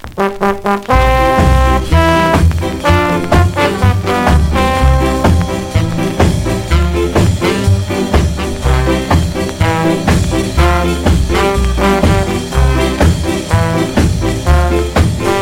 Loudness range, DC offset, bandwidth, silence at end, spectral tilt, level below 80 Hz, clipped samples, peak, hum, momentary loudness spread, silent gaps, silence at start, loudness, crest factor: 2 LU; under 0.1%; 16.5 kHz; 0 s; -6 dB/octave; -18 dBFS; under 0.1%; 0 dBFS; none; 5 LU; none; 0.05 s; -12 LUFS; 12 dB